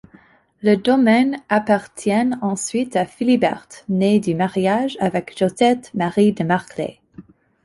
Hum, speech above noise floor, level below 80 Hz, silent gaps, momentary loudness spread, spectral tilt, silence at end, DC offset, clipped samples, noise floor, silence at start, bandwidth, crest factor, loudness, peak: none; 33 dB; -58 dBFS; none; 7 LU; -6 dB/octave; 0.45 s; under 0.1%; under 0.1%; -51 dBFS; 0.65 s; 11.5 kHz; 16 dB; -19 LUFS; -2 dBFS